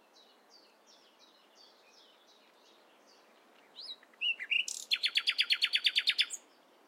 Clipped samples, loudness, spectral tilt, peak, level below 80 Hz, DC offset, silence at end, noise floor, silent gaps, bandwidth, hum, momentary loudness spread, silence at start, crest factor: under 0.1%; -30 LUFS; 4.5 dB/octave; -14 dBFS; under -90 dBFS; under 0.1%; 0.5 s; -63 dBFS; none; 16 kHz; none; 18 LU; 3.75 s; 24 dB